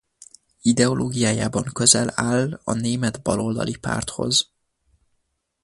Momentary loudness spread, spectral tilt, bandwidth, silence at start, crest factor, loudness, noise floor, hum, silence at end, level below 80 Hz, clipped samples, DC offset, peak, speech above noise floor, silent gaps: 9 LU; -3.5 dB/octave; 11.5 kHz; 0.65 s; 22 dB; -21 LUFS; -72 dBFS; none; 1.2 s; -50 dBFS; under 0.1%; under 0.1%; -2 dBFS; 51 dB; none